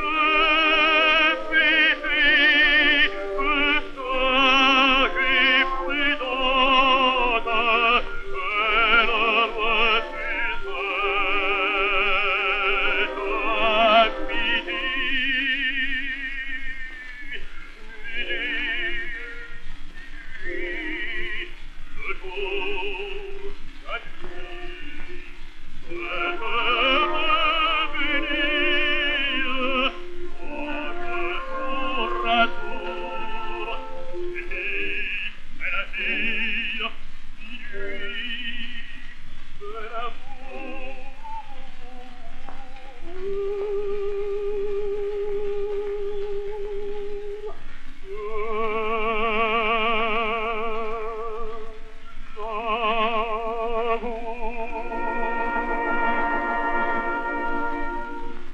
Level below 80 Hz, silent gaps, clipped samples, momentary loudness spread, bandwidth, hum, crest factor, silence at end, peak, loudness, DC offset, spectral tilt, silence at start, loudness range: -34 dBFS; none; under 0.1%; 21 LU; 6.2 kHz; none; 18 dB; 0 s; -4 dBFS; -22 LUFS; under 0.1%; -4 dB/octave; 0 s; 15 LU